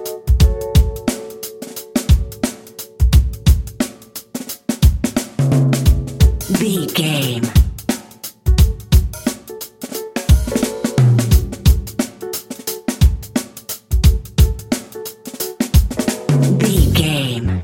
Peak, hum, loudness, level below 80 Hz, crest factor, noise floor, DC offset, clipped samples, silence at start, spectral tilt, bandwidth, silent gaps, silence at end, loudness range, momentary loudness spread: 0 dBFS; none; -17 LUFS; -18 dBFS; 16 dB; -35 dBFS; under 0.1%; under 0.1%; 0 s; -5.5 dB/octave; 17 kHz; none; 0 s; 2 LU; 13 LU